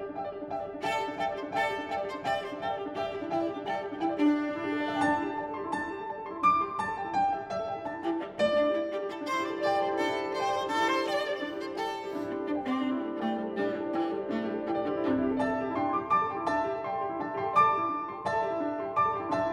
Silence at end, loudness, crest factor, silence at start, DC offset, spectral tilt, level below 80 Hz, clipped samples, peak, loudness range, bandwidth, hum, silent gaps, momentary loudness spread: 0 s; -30 LUFS; 18 dB; 0 s; under 0.1%; -5 dB/octave; -64 dBFS; under 0.1%; -12 dBFS; 3 LU; 14 kHz; none; none; 7 LU